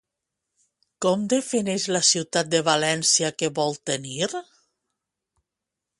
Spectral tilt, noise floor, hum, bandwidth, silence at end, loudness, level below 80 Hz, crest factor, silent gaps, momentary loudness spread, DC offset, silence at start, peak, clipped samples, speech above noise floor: -2.5 dB/octave; -86 dBFS; none; 11.5 kHz; 1.6 s; -22 LUFS; -68 dBFS; 20 dB; none; 9 LU; under 0.1%; 1 s; -6 dBFS; under 0.1%; 62 dB